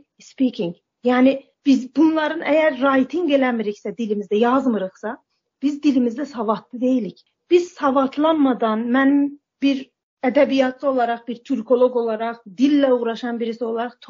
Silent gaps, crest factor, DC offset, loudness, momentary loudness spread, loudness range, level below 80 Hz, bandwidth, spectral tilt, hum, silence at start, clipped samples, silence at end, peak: 10.03-10.17 s; 16 dB; under 0.1%; -20 LUFS; 9 LU; 3 LU; -70 dBFS; 7.4 kHz; -6 dB/octave; none; 0.4 s; under 0.1%; 0.05 s; -4 dBFS